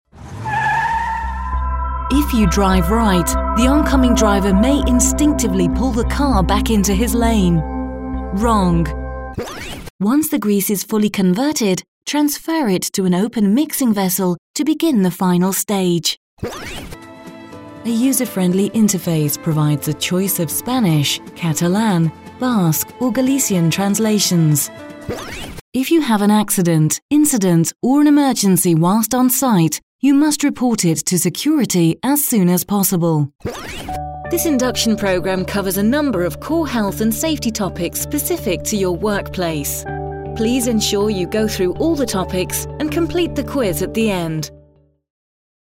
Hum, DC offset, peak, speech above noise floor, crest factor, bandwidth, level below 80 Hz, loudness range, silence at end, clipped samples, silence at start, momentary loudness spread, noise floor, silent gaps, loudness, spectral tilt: none; under 0.1%; 0 dBFS; 36 dB; 16 dB; 16 kHz; -30 dBFS; 5 LU; 1.2 s; under 0.1%; 0.15 s; 11 LU; -52 dBFS; 9.90-9.99 s, 11.88-12.01 s, 14.38-14.54 s, 16.17-16.37 s, 25.61-25.72 s, 27.02-27.09 s, 29.83-29.99 s; -17 LUFS; -5 dB/octave